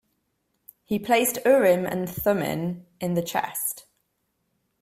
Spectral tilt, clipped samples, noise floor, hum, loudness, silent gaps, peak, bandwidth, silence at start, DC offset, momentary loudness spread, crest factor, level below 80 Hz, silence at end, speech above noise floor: -4.5 dB/octave; under 0.1%; -75 dBFS; none; -24 LUFS; none; -6 dBFS; 16 kHz; 0.9 s; under 0.1%; 11 LU; 18 dB; -60 dBFS; 1 s; 51 dB